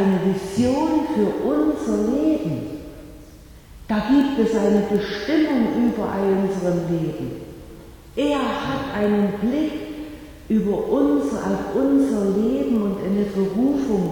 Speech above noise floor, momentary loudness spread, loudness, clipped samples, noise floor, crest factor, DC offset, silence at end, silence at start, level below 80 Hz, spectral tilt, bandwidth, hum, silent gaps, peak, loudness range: 23 dB; 12 LU; -21 LUFS; under 0.1%; -43 dBFS; 14 dB; under 0.1%; 0 s; 0 s; -46 dBFS; -7 dB/octave; 18.5 kHz; none; none; -6 dBFS; 3 LU